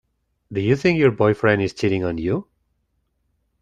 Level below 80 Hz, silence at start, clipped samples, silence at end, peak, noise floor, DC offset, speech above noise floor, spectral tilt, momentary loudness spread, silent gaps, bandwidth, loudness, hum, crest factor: -52 dBFS; 0.5 s; under 0.1%; 1.2 s; -4 dBFS; -70 dBFS; under 0.1%; 51 dB; -7.5 dB/octave; 8 LU; none; 9.6 kHz; -20 LUFS; none; 18 dB